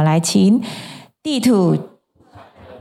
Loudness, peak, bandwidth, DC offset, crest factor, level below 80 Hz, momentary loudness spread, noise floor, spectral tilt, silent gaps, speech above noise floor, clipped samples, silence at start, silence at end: -16 LUFS; -4 dBFS; 15 kHz; under 0.1%; 14 dB; -60 dBFS; 16 LU; -48 dBFS; -6 dB/octave; none; 32 dB; under 0.1%; 0 s; 0.05 s